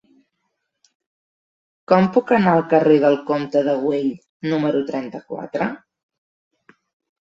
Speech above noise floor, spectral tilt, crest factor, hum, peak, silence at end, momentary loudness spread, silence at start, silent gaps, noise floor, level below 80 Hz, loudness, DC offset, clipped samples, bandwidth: 57 dB; -8 dB/octave; 20 dB; none; -2 dBFS; 1.45 s; 13 LU; 1.9 s; 4.29-4.40 s; -75 dBFS; -64 dBFS; -19 LUFS; under 0.1%; under 0.1%; 7.6 kHz